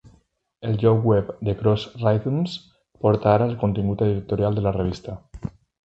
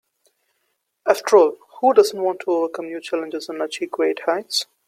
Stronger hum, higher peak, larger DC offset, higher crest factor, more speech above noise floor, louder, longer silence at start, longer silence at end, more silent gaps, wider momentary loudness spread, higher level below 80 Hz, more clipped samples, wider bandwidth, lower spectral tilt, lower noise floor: neither; about the same, -2 dBFS vs -2 dBFS; neither; about the same, 20 dB vs 20 dB; second, 40 dB vs 53 dB; about the same, -22 LUFS vs -20 LUFS; second, 0.6 s vs 1.05 s; first, 0.4 s vs 0.25 s; neither; first, 16 LU vs 12 LU; first, -44 dBFS vs -70 dBFS; neither; second, 7.8 kHz vs 16 kHz; first, -9 dB/octave vs -2.5 dB/octave; second, -61 dBFS vs -72 dBFS